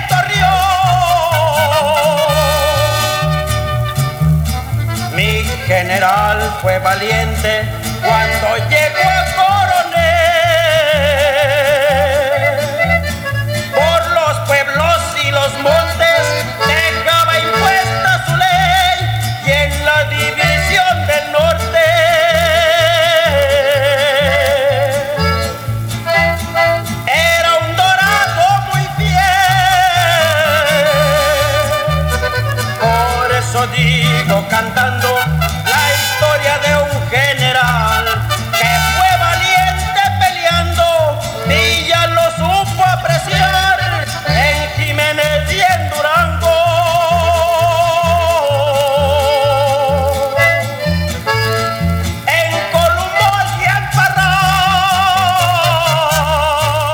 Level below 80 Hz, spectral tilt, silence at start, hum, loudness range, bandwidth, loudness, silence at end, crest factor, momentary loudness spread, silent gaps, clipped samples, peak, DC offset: -28 dBFS; -4 dB/octave; 0 s; none; 3 LU; 18.5 kHz; -12 LUFS; 0 s; 12 dB; 5 LU; none; under 0.1%; 0 dBFS; under 0.1%